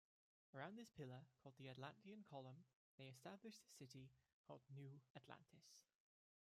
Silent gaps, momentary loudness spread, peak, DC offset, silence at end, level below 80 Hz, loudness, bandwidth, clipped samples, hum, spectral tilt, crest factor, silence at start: 2.75-2.98 s, 4.33-4.44 s, 5.10-5.15 s; 10 LU; -40 dBFS; under 0.1%; 0.65 s; under -90 dBFS; -62 LUFS; 15 kHz; under 0.1%; none; -5.5 dB/octave; 22 dB; 0.55 s